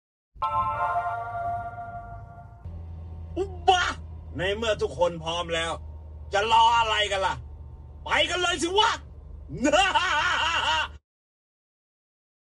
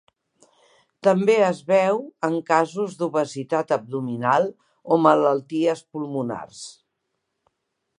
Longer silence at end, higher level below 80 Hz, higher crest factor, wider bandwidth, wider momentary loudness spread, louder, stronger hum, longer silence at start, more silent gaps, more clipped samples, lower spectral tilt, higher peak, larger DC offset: first, 1.55 s vs 1.25 s; first, -44 dBFS vs -74 dBFS; about the same, 22 dB vs 22 dB; about the same, 11.5 kHz vs 11 kHz; first, 21 LU vs 12 LU; second, -25 LUFS vs -22 LUFS; neither; second, 0.35 s vs 1.05 s; neither; neither; second, -3 dB/octave vs -6 dB/octave; second, -6 dBFS vs -2 dBFS; neither